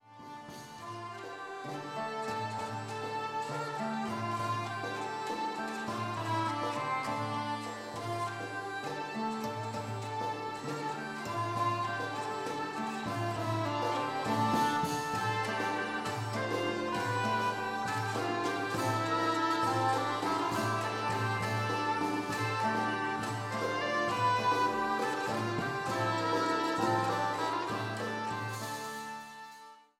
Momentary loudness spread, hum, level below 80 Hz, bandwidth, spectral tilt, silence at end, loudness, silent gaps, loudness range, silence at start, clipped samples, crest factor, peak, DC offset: 8 LU; none; -72 dBFS; 16.5 kHz; -5 dB/octave; 0.2 s; -34 LUFS; none; 6 LU; 0.05 s; under 0.1%; 16 dB; -18 dBFS; under 0.1%